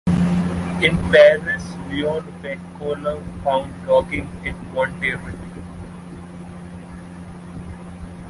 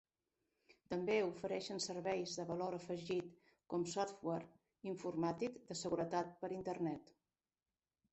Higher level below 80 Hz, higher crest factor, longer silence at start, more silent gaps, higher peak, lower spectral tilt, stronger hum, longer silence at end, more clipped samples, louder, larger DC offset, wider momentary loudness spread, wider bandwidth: first, -40 dBFS vs -78 dBFS; about the same, 20 dB vs 18 dB; second, 0.05 s vs 0.7 s; neither; first, -2 dBFS vs -24 dBFS; first, -6.5 dB/octave vs -5 dB/octave; neither; second, 0 s vs 1.1 s; neither; first, -20 LUFS vs -43 LUFS; neither; first, 22 LU vs 8 LU; first, 11.5 kHz vs 8.2 kHz